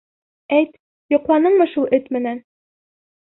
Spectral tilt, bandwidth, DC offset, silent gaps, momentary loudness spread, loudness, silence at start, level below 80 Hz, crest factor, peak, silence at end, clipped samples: -10 dB/octave; 4.1 kHz; under 0.1%; 0.80-1.09 s; 11 LU; -18 LUFS; 0.5 s; -64 dBFS; 16 dB; -4 dBFS; 0.85 s; under 0.1%